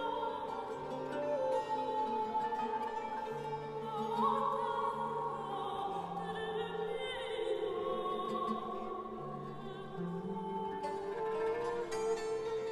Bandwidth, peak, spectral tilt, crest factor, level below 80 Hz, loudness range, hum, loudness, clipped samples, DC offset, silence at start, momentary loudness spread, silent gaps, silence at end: 13 kHz; -22 dBFS; -5.5 dB/octave; 16 dB; -68 dBFS; 3 LU; none; -38 LUFS; under 0.1%; under 0.1%; 0 s; 7 LU; none; 0 s